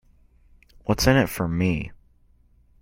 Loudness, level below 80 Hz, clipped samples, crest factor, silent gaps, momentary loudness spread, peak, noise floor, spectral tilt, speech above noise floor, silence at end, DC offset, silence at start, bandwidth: -23 LUFS; -40 dBFS; under 0.1%; 24 dB; none; 14 LU; -2 dBFS; -58 dBFS; -5.5 dB/octave; 36 dB; 0.85 s; under 0.1%; 0.85 s; 16.5 kHz